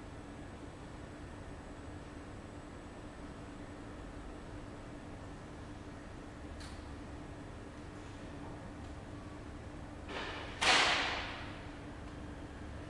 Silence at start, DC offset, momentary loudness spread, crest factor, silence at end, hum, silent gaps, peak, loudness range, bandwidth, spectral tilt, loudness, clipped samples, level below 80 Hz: 0 s; under 0.1%; 15 LU; 26 dB; 0 s; none; none; -16 dBFS; 14 LU; 11.5 kHz; -3 dB/octave; -41 LUFS; under 0.1%; -54 dBFS